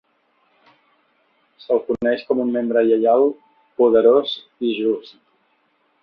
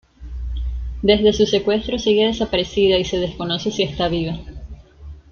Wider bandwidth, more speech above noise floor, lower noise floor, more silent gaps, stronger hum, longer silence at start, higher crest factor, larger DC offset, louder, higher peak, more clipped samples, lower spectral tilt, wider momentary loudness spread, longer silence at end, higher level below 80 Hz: second, 5.4 kHz vs 7 kHz; first, 46 dB vs 21 dB; first, -64 dBFS vs -39 dBFS; neither; neither; first, 1.7 s vs 0.2 s; about the same, 18 dB vs 18 dB; neither; about the same, -18 LUFS vs -19 LUFS; about the same, -2 dBFS vs -2 dBFS; neither; first, -7.5 dB/octave vs -5.5 dB/octave; second, 12 LU vs 15 LU; first, 1.05 s vs 0.1 s; second, -62 dBFS vs -32 dBFS